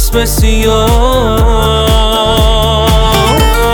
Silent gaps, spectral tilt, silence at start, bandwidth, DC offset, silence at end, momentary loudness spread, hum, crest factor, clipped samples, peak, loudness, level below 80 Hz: none; -4.5 dB/octave; 0 s; over 20 kHz; 0.1%; 0 s; 1 LU; none; 8 dB; under 0.1%; 0 dBFS; -9 LUFS; -12 dBFS